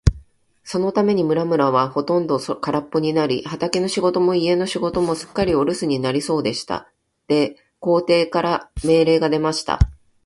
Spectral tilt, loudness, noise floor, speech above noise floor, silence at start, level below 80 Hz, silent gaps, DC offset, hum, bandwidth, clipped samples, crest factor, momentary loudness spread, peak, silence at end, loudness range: -6 dB/octave; -20 LUFS; -49 dBFS; 30 dB; 0.05 s; -34 dBFS; none; under 0.1%; none; 11.5 kHz; under 0.1%; 20 dB; 6 LU; 0 dBFS; 0.3 s; 2 LU